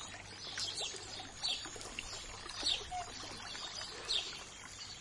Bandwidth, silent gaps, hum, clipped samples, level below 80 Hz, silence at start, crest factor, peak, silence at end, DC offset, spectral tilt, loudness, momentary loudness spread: 11.5 kHz; none; none; under 0.1%; -60 dBFS; 0 s; 20 dB; -22 dBFS; 0 s; under 0.1%; -0.5 dB/octave; -40 LUFS; 11 LU